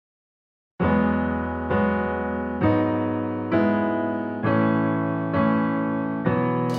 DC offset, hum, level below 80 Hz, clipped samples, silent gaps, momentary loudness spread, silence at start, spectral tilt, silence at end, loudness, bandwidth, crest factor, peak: under 0.1%; none; -46 dBFS; under 0.1%; none; 5 LU; 0.8 s; -9 dB/octave; 0 s; -23 LUFS; 6.4 kHz; 16 dB; -8 dBFS